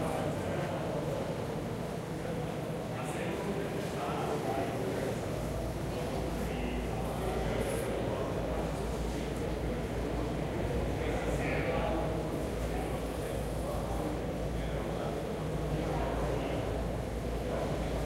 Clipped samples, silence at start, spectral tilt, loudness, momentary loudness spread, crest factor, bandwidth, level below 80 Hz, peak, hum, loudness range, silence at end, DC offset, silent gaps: under 0.1%; 0 s; -6 dB/octave; -35 LUFS; 3 LU; 14 dB; 16 kHz; -42 dBFS; -20 dBFS; none; 2 LU; 0 s; under 0.1%; none